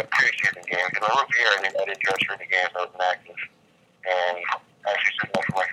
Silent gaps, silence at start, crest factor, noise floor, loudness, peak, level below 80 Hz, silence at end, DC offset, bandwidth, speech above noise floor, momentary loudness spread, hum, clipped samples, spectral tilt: none; 0 s; 20 dB; -60 dBFS; -23 LUFS; -4 dBFS; -70 dBFS; 0 s; under 0.1%; 15.5 kHz; 36 dB; 10 LU; none; under 0.1%; -2.5 dB/octave